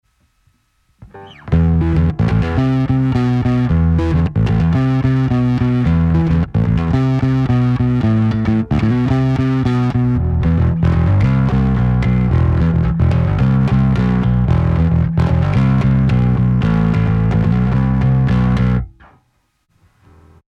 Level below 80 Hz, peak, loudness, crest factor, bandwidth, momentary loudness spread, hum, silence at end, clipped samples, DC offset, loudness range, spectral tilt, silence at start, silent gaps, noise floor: -24 dBFS; -2 dBFS; -15 LUFS; 12 dB; 6.2 kHz; 2 LU; none; 1.7 s; under 0.1%; under 0.1%; 2 LU; -9.5 dB/octave; 1 s; none; -62 dBFS